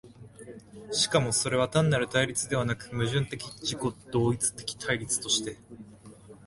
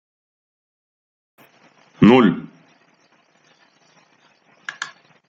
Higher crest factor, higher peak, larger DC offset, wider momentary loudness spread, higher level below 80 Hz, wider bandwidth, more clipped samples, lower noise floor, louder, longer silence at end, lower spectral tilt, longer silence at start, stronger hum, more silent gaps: about the same, 20 dB vs 22 dB; second, -10 dBFS vs -2 dBFS; neither; about the same, 21 LU vs 23 LU; about the same, -56 dBFS vs -56 dBFS; first, 12 kHz vs 7.6 kHz; neither; second, -50 dBFS vs -59 dBFS; second, -28 LUFS vs -16 LUFS; second, 0 s vs 0.45 s; second, -3.5 dB/octave vs -7 dB/octave; second, 0.05 s vs 2 s; neither; neither